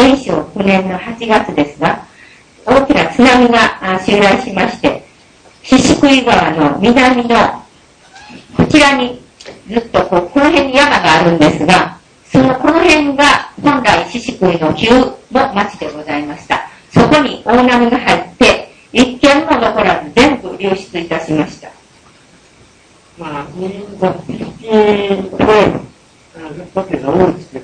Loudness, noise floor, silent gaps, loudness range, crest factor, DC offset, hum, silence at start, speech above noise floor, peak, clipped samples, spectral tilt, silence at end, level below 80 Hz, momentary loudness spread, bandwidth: -11 LUFS; -45 dBFS; none; 7 LU; 12 dB; under 0.1%; none; 0 s; 34 dB; 0 dBFS; 0.6%; -5 dB/octave; 0 s; -38 dBFS; 13 LU; 11 kHz